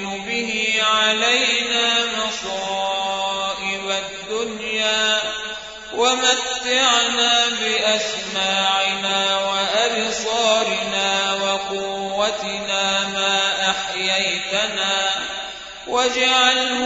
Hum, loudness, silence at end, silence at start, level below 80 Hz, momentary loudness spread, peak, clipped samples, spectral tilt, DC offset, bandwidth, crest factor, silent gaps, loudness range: none; -18 LUFS; 0 s; 0 s; -56 dBFS; 9 LU; -2 dBFS; under 0.1%; -0.5 dB/octave; under 0.1%; 8 kHz; 18 dB; none; 4 LU